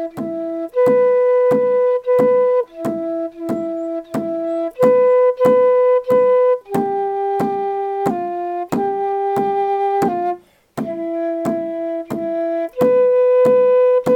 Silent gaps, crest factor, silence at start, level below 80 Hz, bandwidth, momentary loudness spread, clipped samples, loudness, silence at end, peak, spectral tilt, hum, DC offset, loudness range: none; 16 dB; 0 s; -60 dBFS; 13.5 kHz; 11 LU; under 0.1%; -17 LUFS; 0 s; 0 dBFS; -7.5 dB/octave; none; under 0.1%; 5 LU